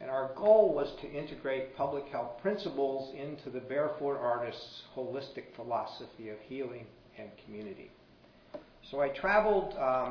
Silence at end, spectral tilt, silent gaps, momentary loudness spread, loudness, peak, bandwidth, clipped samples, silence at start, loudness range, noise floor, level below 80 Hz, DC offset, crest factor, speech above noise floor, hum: 0 s; -3.5 dB/octave; none; 21 LU; -33 LUFS; -12 dBFS; 5.4 kHz; under 0.1%; 0 s; 11 LU; -60 dBFS; -60 dBFS; under 0.1%; 22 dB; 27 dB; none